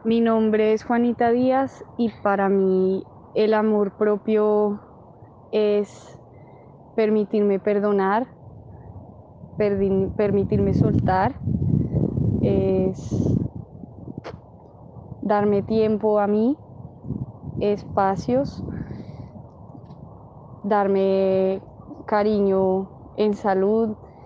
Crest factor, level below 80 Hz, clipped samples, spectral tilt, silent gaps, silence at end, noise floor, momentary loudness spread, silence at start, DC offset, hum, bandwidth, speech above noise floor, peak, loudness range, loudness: 16 dB; -44 dBFS; under 0.1%; -9 dB/octave; none; 0 s; -46 dBFS; 19 LU; 0.05 s; under 0.1%; none; 7.4 kHz; 26 dB; -6 dBFS; 4 LU; -22 LUFS